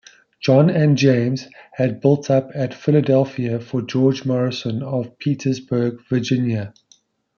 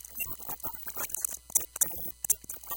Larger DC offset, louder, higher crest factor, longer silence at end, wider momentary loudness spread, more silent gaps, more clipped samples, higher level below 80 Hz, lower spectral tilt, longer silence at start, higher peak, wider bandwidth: neither; first, -19 LUFS vs -31 LUFS; second, 16 dB vs 26 dB; first, 0.7 s vs 0 s; first, 10 LU vs 7 LU; neither; neither; about the same, -62 dBFS vs -58 dBFS; first, -7.5 dB/octave vs -0.5 dB/octave; first, 0.4 s vs 0 s; first, -2 dBFS vs -8 dBFS; second, 7 kHz vs 17.5 kHz